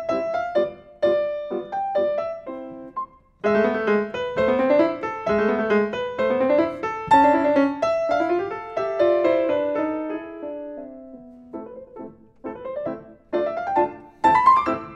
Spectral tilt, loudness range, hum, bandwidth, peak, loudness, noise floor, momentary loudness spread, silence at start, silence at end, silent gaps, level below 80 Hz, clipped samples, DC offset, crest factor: -6.5 dB/octave; 10 LU; none; 9.2 kHz; -4 dBFS; -22 LUFS; -43 dBFS; 20 LU; 0 s; 0 s; none; -56 dBFS; under 0.1%; under 0.1%; 18 dB